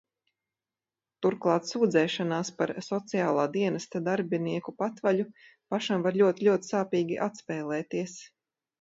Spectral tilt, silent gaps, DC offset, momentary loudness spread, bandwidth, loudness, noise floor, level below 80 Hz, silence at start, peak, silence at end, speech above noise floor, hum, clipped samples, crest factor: -5.5 dB/octave; none; under 0.1%; 9 LU; 7.8 kHz; -29 LUFS; under -90 dBFS; -76 dBFS; 1.2 s; -10 dBFS; 0.55 s; over 62 dB; none; under 0.1%; 18 dB